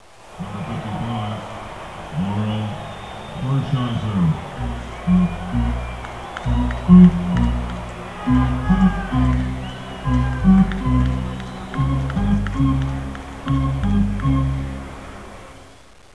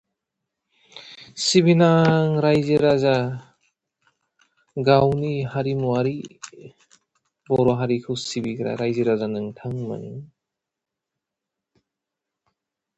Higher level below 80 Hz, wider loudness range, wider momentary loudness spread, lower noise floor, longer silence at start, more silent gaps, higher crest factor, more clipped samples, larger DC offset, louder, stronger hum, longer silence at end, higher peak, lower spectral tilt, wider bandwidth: first, -28 dBFS vs -56 dBFS; second, 7 LU vs 10 LU; second, 16 LU vs 21 LU; second, -46 dBFS vs -85 dBFS; second, 0.25 s vs 0.95 s; neither; about the same, 20 dB vs 20 dB; neither; first, 0.3% vs under 0.1%; about the same, -20 LUFS vs -21 LUFS; neither; second, 0.45 s vs 2.7 s; about the same, 0 dBFS vs -2 dBFS; first, -8 dB/octave vs -6 dB/octave; first, 11 kHz vs 8.8 kHz